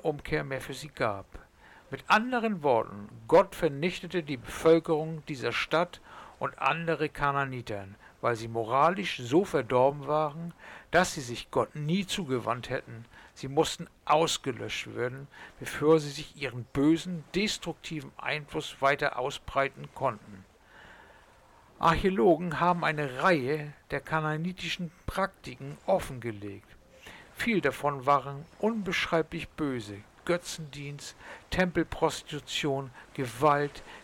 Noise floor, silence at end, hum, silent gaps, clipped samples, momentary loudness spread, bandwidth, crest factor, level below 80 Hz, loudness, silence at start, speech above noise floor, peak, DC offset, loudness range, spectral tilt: -58 dBFS; 0 s; none; none; under 0.1%; 15 LU; 17.5 kHz; 18 dB; -54 dBFS; -29 LUFS; 0.05 s; 28 dB; -12 dBFS; under 0.1%; 5 LU; -5 dB/octave